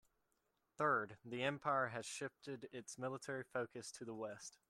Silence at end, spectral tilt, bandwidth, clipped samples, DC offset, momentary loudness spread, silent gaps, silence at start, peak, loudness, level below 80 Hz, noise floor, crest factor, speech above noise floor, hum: 0.2 s; -4 dB/octave; 14 kHz; under 0.1%; under 0.1%; 12 LU; none; 0.8 s; -26 dBFS; -44 LUFS; -84 dBFS; -85 dBFS; 20 dB; 41 dB; none